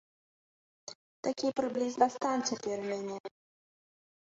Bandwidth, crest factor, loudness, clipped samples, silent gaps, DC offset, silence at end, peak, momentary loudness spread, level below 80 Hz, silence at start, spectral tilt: 8 kHz; 24 dB; -33 LUFS; under 0.1%; 0.95-1.23 s, 3.20-3.24 s; under 0.1%; 0.95 s; -12 dBFS; 20 LU; -80 dBFS; 0.85 s; -3.5 dB/octave